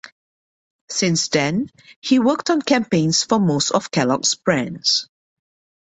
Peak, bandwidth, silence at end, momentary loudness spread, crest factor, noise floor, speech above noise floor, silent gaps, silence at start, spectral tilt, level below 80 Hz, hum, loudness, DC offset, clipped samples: -4 dBFS; 8.4 kHz; 0.9 s; 5 LU; 18 dB; under -90 dBFS; over 71 dB; 0.12-0.88 s, 1.96-2.02 s; 0.05 s; -4 dB/octave; -60 dBFS; none; -18 LUFS; under 0.1%; under 0.1%